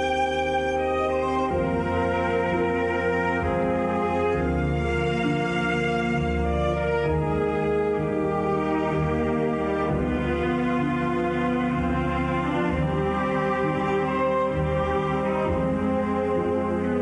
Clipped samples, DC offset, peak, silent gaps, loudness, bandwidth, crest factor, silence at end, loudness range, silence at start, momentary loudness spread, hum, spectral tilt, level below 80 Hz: under 0.1%; under 0.1%; -12 dBFS; none; -24 LUFS; 11 kHz; 10 dB; 0 s; 0 LU; 0 s; 1 LU; none; -7.5 dB/octave; -38 dBFS